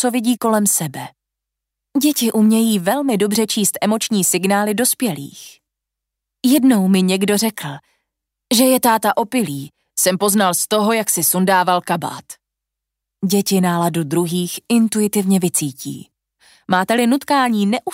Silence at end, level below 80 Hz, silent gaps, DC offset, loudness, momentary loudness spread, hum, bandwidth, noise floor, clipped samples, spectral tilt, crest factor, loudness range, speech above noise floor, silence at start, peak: 0 s; -66 dBFS; none; under 0.1%; -16 LUFS; 12 LU; none; 16.5 kHz; -82 dBFS; under 0.1%; -4 dB/octave; 16 dB; 3 LU; 65 dB; 0 s; -2 dBFS